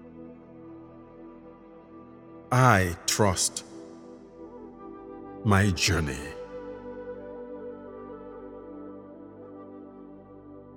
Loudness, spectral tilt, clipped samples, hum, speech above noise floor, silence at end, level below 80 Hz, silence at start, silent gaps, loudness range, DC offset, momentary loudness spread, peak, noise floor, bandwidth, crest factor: -26 LUFS; -4.5 dB/octave; under 0.1%; none; 25 dB; 0 s; -50 dBFS; 0 s; none; 15 LU; under 0.1%; 25 LU; -4 dBFS; -49 dBFS; 18 kHz; 28 dB